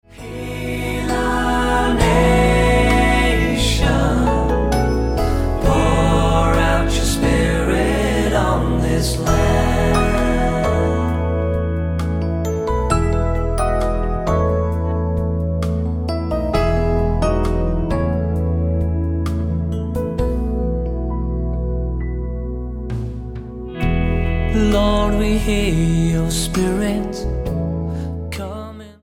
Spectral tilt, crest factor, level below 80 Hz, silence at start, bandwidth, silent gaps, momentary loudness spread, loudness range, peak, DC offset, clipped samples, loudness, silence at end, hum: -6 dB/octave; 16 dB; -22 dBFS; 0.1 s; 16.5 kHz; none; 9 LU; 6 LU; -2 dBFS; under 0.1%; under 0.1%; -19 LUFS; 0.1 s; none